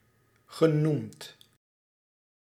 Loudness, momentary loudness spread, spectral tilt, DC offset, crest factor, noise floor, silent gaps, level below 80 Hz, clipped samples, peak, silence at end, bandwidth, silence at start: -27 LUFS; 22 LU; -7.5 dB/octave; under 0.1%; 22 dB; -65 dBFS; none; -78 dBFS; under 0.1%; -10 dBFS; 1.3 s; 14.5 kHz; 0.5 s